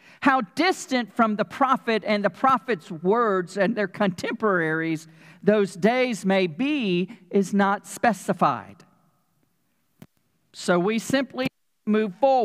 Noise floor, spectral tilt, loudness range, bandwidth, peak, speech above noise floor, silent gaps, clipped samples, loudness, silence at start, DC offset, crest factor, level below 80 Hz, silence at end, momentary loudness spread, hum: -72 dBFS; -5.5 dB/octave; 5 LU; 15.5 kHz; -4 dBFS; 49 dB; none; under 0.1%; -24 LUFS; 0.2 s; under 0.1%; 20 dB; -70 dBFS; 0 s; 5 LU; none